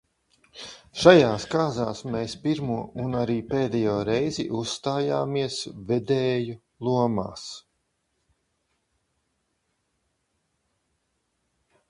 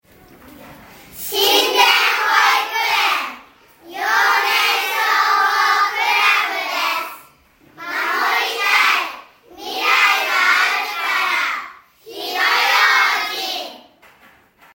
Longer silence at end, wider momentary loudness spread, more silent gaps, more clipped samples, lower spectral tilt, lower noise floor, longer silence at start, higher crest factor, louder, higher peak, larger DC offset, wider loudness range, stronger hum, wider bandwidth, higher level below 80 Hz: first, 4.3 s vs 0.95 s; about the same, 16 LU vs 15 LU; neither; neither; first, -5.5 dB/octave vs 1 dB/octave; first, -75 dBFS vs -51 dBFS; about the same, 0.55 s vs 0.45 s; first, 26 dB vs 18 dB; second, -25 LUFS vs -15 LUFS; about the same, 0 dBFS vs 0 dBFS; neither; first, 9 LU vs 3 LU; neither; second, 11.5 kHz vs 16.5 kHz; first, -56 dBFS vs -64 dBFS